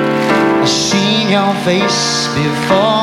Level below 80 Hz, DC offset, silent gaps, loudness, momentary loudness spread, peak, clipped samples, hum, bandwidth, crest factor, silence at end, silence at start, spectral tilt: -48 dBFS; under 0.1%; none; -12 LUFS; 2 LU; 0 dBFS; under 0.1%; none; 15.5 kHz; 12 dB; 0 s; 0 s; -4 dB/octave